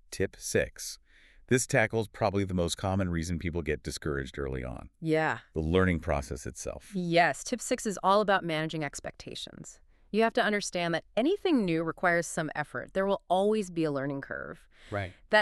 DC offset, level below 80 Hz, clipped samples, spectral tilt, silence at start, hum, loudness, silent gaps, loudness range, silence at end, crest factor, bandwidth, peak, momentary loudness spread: under 0.1%; -48 dBFS; under 0.1%; -5 dB/octave; 0.1 s; none; -30 LUFS; none; 3 LU; 0 s; 20 dB; 13.5 kHz; -10 dBFS; 13 LU